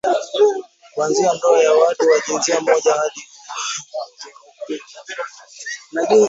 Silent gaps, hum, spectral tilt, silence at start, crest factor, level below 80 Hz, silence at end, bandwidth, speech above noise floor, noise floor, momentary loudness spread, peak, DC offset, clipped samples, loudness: none; none; -2.5 dB/octave; 0.05 s; 16 dB; -70 dBFS; 0 s; 8 kHz; 25 dB; -41 dBFS; 18 LU; -2 dBFS; under 0.1%; under 0.1%; -17 LUFS